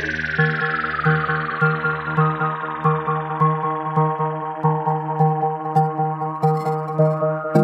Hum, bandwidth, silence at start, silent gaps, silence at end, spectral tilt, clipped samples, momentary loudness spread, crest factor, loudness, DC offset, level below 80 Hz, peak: none; 6 kHz; 0 s; none; 0 s; -8.5 dB/octave; under 0.1%; 4 LU; 16 dB; -20 LUFS; under 0.1%; -52 dBFS; -4 dBFS